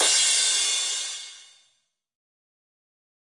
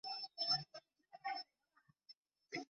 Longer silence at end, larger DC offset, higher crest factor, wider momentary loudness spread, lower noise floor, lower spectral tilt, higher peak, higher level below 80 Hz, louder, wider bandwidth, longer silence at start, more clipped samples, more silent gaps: first, 1.8 s vs 0.05 s; neither; about the same, 18 dB vs 22 dB; second, 17 LU vs 26 LU; second, -71 dBFS vs -77 dBFS; second, 4 dB/octave vs 0 dB/octave; first, -10 dBFS vs -26 dBFS; first, -76 dBFS vs -90 dBFS; first, -21 LUFS vs -42 LUFS; first, 11.5 kHz vs 7.4 kHz; about the same, 0 s vs 0.05 s; neither; second, none vs 2.17-2.23 s